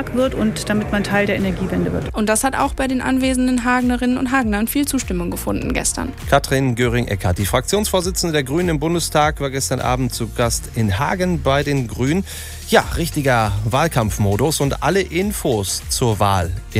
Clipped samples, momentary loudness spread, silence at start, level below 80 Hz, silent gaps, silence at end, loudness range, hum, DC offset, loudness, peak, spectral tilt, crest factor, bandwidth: under 0.1%; 4 LU; 0 s; -32 dBFS; none; 0 s; 1 LU; none; under 0.1%; -18 LUFS; 0 dBFS; -5 dB/octave; 18 dB; 16 kHz